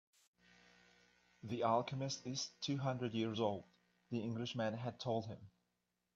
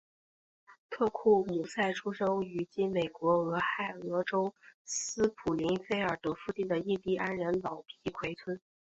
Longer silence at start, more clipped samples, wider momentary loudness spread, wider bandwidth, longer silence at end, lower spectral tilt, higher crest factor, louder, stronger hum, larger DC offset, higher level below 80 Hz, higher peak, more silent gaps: first, 1.45 s vs 0.7 s; neither; about the same, 11 LU vs 9 LU; about the same, 7.8 kHz vs 8.2 kHz; first, 0.65 s vs 0.35 s; about the same, -5.5 dB/octave vs -4.5 dB/octave; about the same, 20 dB vs 18 dB; second, -41 LUFS vs -33 LUFS; first, 60 Hz at -65 dBFS vs none; neither; second, -80 dBFS vs -66 dBFS; second, -22 dBFS vs -14 dBFS; second, none vs 0.78-0.89 s, 4.74-4.85 s